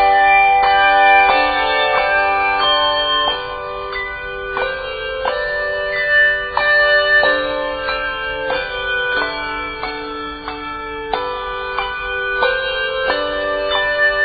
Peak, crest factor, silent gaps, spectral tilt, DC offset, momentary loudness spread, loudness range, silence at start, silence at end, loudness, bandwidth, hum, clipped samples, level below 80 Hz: 0 dBFS; 16 dB; none; 1.5 dB/octave; under 0.1%; 13 LU; 8 LU; 0 s; 0 s; -16 LUFS; 5 kHz; none; under 0.1%; -40 dBFS